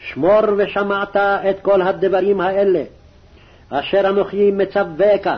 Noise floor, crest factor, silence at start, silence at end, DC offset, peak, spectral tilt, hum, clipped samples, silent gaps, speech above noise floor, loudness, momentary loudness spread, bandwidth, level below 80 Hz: -46 dBFS; 12 dB; 0 s; 0 s; under 0.1%; -6 dBFS; -8 dB/octave; none; under 0.1%; none; 30 dB; -17 LUFS; 5 LU; 6 kHz; -50 dBFS